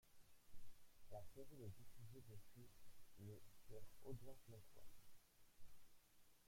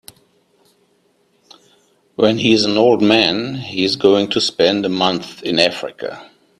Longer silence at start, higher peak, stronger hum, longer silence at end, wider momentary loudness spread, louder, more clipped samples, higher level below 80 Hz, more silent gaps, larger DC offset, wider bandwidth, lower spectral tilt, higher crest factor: second, 0.05 s vs 2.2 s; second, -42 dBFS vs 0 dBFS; neither; second, 0 s vs 0.35 s; second, 7 LU vs 14 LU; second, -63 LUFS vs -15 LUFS; neither; second, -72 dBFS vs -56 dBFS; neither; neither; first, 16.5 kHz vs 13 kHz; first, -6 dB/octave vs -4.5 dB/octave; about the same, 14 dB vs 18 dB